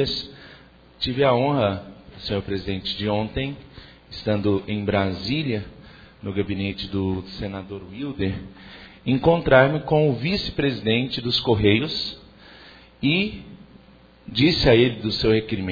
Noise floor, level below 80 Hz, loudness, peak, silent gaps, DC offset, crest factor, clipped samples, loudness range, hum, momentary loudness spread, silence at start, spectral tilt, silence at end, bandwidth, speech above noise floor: -51 dBFS; -44 dBFS; -22 LUFS; -2 dBFS; none; under 0.1%; 20 dB; under 0.1%; 7 LU; none; 17 LU; 0 s; -7 dB/octave; 0 s; 5 kHz; 29 dB